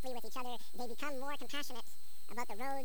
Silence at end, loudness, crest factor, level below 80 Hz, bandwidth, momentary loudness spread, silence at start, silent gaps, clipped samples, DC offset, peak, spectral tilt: 0 s; -44 LUFS; 20 dB; -78 dBFS; over 20 kHz; 8 LU; 0 s; none; under 0.1%; 3%; -24 dBFS; -3.5 dB/octave